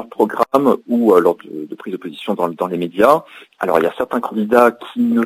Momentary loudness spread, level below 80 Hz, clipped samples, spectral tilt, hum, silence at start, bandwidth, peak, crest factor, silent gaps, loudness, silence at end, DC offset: 14 LU; -60 dBFS; under 0.1%; -6.5 dB/octave; none; 0 s; 16 kHz; 0 dBFS; 16 dB; none; -16 LUFS; 0 s; under 0.1%